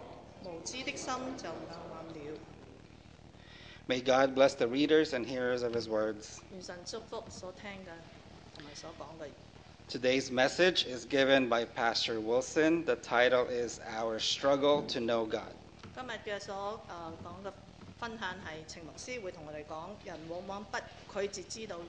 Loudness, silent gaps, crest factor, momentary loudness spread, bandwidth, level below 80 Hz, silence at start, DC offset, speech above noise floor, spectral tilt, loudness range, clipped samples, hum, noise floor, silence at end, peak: -32 LUFS; none; 22 dB; 20 LU; 9.4 kHz; -62 dBFS; 0 s; under 0.1%; 22 dB; -3.5 dB/octave; 13 LU; under 0.1%; none; -55 dBFS; 0 s; -12 dBFS